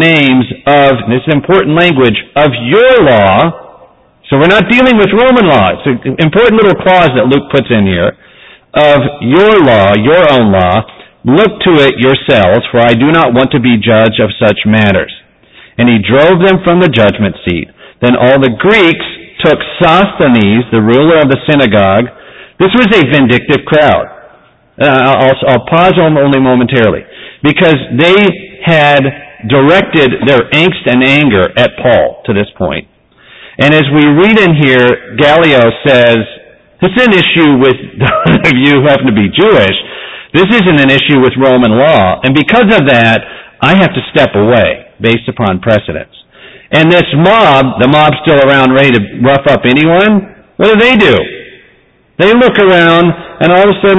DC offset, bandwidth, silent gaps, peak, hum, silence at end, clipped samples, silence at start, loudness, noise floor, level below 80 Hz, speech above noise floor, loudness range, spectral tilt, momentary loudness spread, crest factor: under 0.1%; 8 kHz; none; 0 dBFS; none; 0 s; 0.5%; 0 s; -7 LUFS; -46 dBFS; -34 dBFS; 40 dB; 2 LU; -7.5 dB/octave; 7 LU; 8 dB